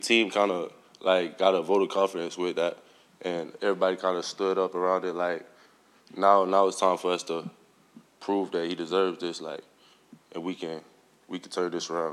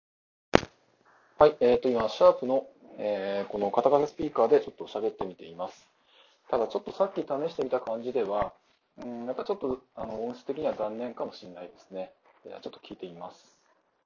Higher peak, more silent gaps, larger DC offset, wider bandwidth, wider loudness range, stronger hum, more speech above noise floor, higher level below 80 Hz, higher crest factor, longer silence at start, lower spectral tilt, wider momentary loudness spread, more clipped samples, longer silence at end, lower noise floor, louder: second, -6 dBFS vs 0 dBFS; neither; neither; first, 13 kHz vs 7.2 kHz; second, 6 LU vs 11 LU; neither; second, 32 dB vs 40 dB; second, -82 dBFS vs -58 dBFS; second, 22 dB vs 28 dB; second, 0 s vs 0.55 s; second, -4 dB/octave vs -6 dB/octave; second, 16 LU vs 20 LU; neither; second, 0 s vs 0.75 s; second, -59 dBFS vs -69 dBFS; about the same, -27 LUFS vs -28 LUFS